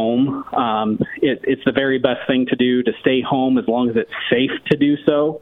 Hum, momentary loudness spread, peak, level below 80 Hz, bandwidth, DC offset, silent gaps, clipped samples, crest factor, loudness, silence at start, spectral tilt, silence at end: none; 3 LU; 0 dBFS; -54 dBFS; 4.1 kHz; under 0.1%; none; under 0.1%; 18 dB; -18 LUFS; 0 s; -8.5 dB/octave; 0.05 s